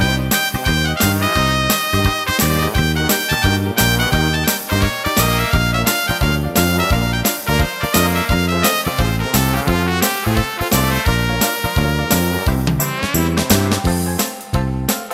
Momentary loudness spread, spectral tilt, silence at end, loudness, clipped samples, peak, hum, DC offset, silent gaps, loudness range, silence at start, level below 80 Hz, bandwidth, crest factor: 3 LU; -4 dB/octave; 0 s; -16 LUFS; under 0.1%; 0 dBFS; none; under 0.1%; none; 1 LU; 0 s; -26 dBFS; 16.5 kHz; 16 dB